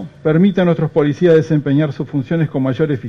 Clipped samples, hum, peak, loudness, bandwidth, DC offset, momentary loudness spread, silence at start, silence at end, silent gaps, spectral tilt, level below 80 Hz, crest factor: under 0.1%; none; -2 dBFS; -15 LUFS; 6.6 kHz; under 0.1%; 6 LU; 0 s; 0 s; none; -9 dB/octave; -52 dBFS; 12 dB